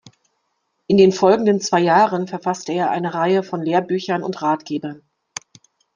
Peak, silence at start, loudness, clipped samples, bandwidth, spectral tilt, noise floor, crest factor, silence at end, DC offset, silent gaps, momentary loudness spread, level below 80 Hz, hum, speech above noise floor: -2 dBFS; 0.9 s; -18 LUFS; under 0.1%; 9.6 kHz; -5.5 dB/octave; -71 dBFS; 18 dB; 1 s; under 0.1%; none; 15 LU; -64 dBFS; none; 54 dB